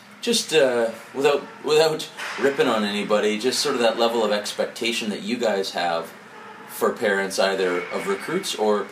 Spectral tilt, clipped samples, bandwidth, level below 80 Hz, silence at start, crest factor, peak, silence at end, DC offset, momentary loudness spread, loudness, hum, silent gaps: -3 dB/octave; under 0.1%; 15.5 kHz; -74 dBFS; 0.05 s; 18 dB; -6 dBFS; 0 s; under 0.1%; 8 LU; -22 LUFS; none; none